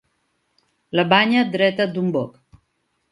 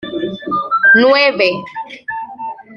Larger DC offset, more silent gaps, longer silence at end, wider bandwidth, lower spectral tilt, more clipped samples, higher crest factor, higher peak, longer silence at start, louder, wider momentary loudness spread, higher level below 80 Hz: neither; neither; first, 0.85 s vs 0 s; first, 11.5 kHz vs 6.8 kHz; first, -7 dB/octave vs -5.5 dB/octave; neither; first, 22 dB vs 14 dB; about the same, 0 dBFS vs 0 dBFS; first, 0.95 s vs 0 s; second, -19 LUFS vs -12 LUFS; second, 10 LU vs 18 LU; second, -66 dBFS vs -60 dBFS